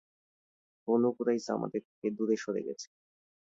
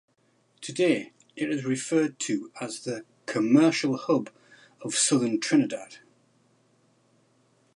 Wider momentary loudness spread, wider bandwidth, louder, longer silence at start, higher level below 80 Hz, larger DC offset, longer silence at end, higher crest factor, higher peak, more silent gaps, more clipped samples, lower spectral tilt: about the same, 15 LU vs 16 LU; second, 7.8 kHz vs 11.5 kHz; second, -33 LUFS vs -26 LUFS; first, 0.85 s vs 0.6 s; about the same, -78 dBFS vs -80 dBFS; neither; second, 0.75 s vs 1.8 s; about the same, 18 dB vs 20 dB; second, -16 dBFS vs -8 dBFS; first, 1.85-2.02 s vs none; neither; first, -6 dB/octave vs -4 dB/octave